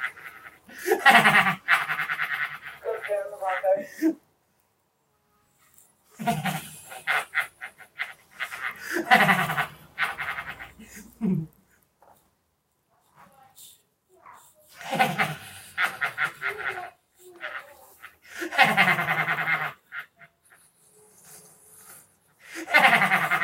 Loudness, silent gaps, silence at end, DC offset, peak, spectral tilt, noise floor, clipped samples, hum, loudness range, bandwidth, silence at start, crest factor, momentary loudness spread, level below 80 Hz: -24 LUFS; none; 0 s; under 0.1%; -2 dBFS; -3.5 dB/octave; -72 dBFS; under 0.1%; none; 11 LU; 16 kHz; 0 s; 26 dB; 22 LU; -68 dBFS